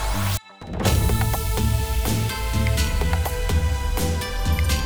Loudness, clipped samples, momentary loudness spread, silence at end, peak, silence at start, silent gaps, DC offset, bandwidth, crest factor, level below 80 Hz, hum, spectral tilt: -23 LUFS; under 0.1%; 4 LU; 0 s; -4 dBFS; 0 s; none; 1%; over 20 kHz; 16 dB; -24 dBFS; none; -4.5 dB/octave